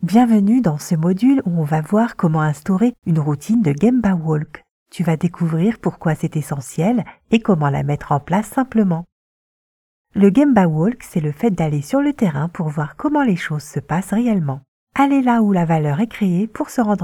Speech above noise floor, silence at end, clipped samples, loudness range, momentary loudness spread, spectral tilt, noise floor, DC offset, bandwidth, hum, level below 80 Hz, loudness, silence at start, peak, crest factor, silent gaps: over 73 dB; 0 s; under 0.1%; 3 LU; 8 LU; -7.5 dB/octave; under -90 dBFS; under 0.1%; 14.5 kHz; none; -50 dBFS; -18 LUFS; 0 s; 0 dBFS; 18 dB; 4.71-4.86 s, 9.12-10.05 s, 14.68-14.87 s